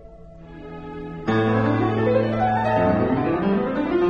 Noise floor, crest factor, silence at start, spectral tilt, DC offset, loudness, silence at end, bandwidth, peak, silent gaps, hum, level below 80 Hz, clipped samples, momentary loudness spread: -42 dBFS; 14 dB; 0 s; -9 dB/octave; under 0.1%; -21 LUFS; 0 s; 7 kHz; -8 dBFS; none; none; -44 dBFS; under 0.1%; 16 LU